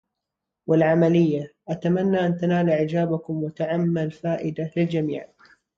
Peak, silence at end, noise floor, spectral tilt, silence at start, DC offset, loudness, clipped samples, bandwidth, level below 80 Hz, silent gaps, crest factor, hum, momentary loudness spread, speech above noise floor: -8 dBFS; 0.5 s; -84 dBFS; -9 dB/octave; 0.7 s; under 0.1%; -23 LUFS; under 0.1%; 7 kHz; -62 dBFS; none; 16 dB; none; 11 LU; 62 dB